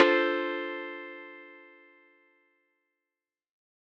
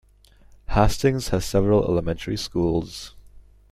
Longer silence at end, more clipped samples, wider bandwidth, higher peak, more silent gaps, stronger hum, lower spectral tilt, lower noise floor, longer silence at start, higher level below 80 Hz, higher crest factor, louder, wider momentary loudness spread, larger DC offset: first, 2.3 s vs 0.3 s; neither; second, 7 kHz vs 15.5 kHz; about the same, -4 dBFS vs -2 dBFS; neither; neither; second, -4 dB/octave vs -6 dB/octave; first, under -90 dBFS vs -53 dBFS; second, 0 s vs 0.7 s; second, under -90 dBFS vs -36 dBFS; first, 28 dB vs 20 dB; second, -30 LUFS vs -23 LUFS; first, 24 LU vs 11 LU; neither